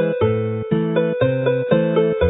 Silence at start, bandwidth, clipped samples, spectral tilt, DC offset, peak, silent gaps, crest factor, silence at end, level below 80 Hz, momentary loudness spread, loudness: 0 s; 4 kHz; under 0.1%; -12.5 dB/octave; under 0.1%; -4 dBFS; none; 14 dB; 0 s; -38 dBFS; 4 LU; -19 LUFS